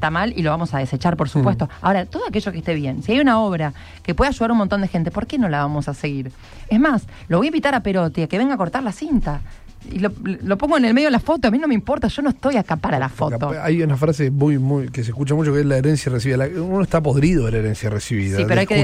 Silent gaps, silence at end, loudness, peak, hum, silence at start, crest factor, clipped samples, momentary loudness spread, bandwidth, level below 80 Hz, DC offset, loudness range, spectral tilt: none; 0 s; -19 LUFS; -6 dBFS; none; 0 s; 14 dB; under 0.1%; 7 LU; 13 kHz; -36 dBFS; under 0.1%; 2 LU; -7 dB/octave